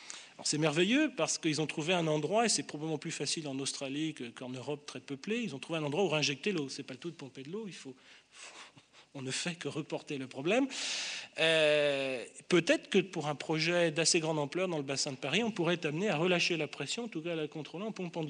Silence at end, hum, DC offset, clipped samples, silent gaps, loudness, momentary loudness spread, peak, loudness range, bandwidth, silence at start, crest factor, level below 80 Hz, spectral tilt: 0 s; none; under 0.1%; under 0.1%; none; -33 LUFS; 15 LU; -14 dBFS; 8 LU; 10 kHz; 0 s; 20 dB; -82 dBFS; -3.5 dB/octave